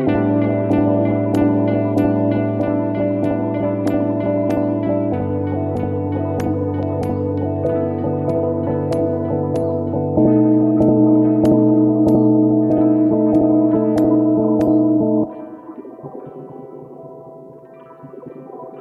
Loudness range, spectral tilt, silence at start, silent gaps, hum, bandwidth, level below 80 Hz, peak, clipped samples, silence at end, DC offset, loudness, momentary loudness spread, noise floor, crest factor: 7 LU; -10 dB/octave; 0 s; none; none; 5.8 kHz; -46 dBFS; -4 dBFS; under 0.1%; 0 s; under 0.1%; -17 LUFS; 20 LU; -40 dBFS; 14 dB